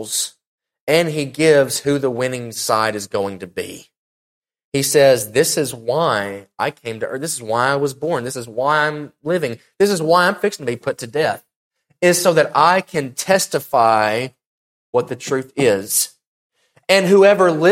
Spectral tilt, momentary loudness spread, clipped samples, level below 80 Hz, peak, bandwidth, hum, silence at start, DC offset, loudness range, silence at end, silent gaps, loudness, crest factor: -3.5 dB/octave; 12 LU; under 0.1%; -60 dBFS; 0 dBFS; 16.5 kHz; none; 0 s; under 0.1%; 4 LU; 0 s; 0.47-0.58 s, 0.80-0.87 s, 3.97-4.42 s, 4.64-4.72 s, 11.56-11.71 s, 14.46-14.93 s, 16.27-16.50 s; -17 LUFS; 18 dB